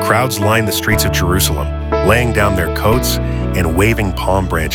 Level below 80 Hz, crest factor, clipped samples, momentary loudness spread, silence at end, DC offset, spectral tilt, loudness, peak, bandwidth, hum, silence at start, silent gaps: -22 dBFS; 14 dB; under 0.1%; 4 LU; 0 s; under 0.1%; -5 dB/octave; -14 LUFS; 0 dBFS; 18 kHz; none; 0 s; none